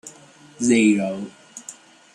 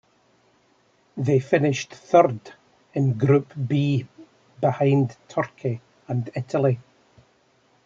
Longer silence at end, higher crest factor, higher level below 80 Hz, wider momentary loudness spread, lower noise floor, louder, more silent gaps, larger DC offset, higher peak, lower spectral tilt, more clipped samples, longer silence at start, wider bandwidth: second, 0.4 s vs 1.05 s; about the same, 18 dB vs 20 dB; about the same, -68 dBFS vs -66 dBFS; first, 22 LU vs 12 LU; second, -48 dBFS vs -62 dBFS; first, -19 LUFS vs -23 LUFS; neither; neither; about the same, -6 dBFS vs -4 dBFS; second, -4.5 dB/octave vs -7.5 dB/octave; neither; second, 0.05 s vs 1.15 s; first, 11.5 kHz vs 7.6 kHz